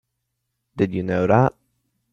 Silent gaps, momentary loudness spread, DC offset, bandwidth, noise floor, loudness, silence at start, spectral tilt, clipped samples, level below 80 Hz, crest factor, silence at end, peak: none; 7 LU; under 0.1%; 7 kHz; -77 dBFS; -20 LUFS; 0.75 s; -9 dB/octave; under 0.1%; -54 dBFS; 20 dB; 0.65 s; -4 dBFS